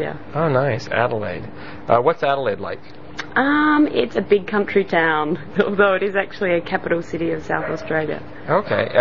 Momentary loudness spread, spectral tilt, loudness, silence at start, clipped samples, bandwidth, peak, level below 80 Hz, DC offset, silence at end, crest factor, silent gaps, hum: 12 LU; -4.5 dB/octave; -20 LUFS; 0 s; under 0.1%; 7.2 kHz; -2 dBFS; -52 dBFS; 2%; 0 s; 18 dB; none; none